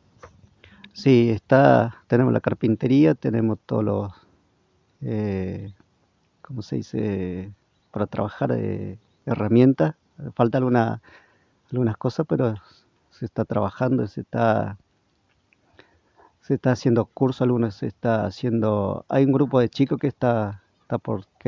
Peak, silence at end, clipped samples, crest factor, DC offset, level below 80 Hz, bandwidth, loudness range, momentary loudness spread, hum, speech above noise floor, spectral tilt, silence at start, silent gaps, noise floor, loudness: -2 dBFS; 0.25 s; under 0.1%; 22 dB; under 0.1%; -52 dBFS; 7.2 kHz; 10 LU; 17 LU; none; 45 dB; -8.5 dB/octave; 0.25 s; none; -66 dBFS; -22 LUFS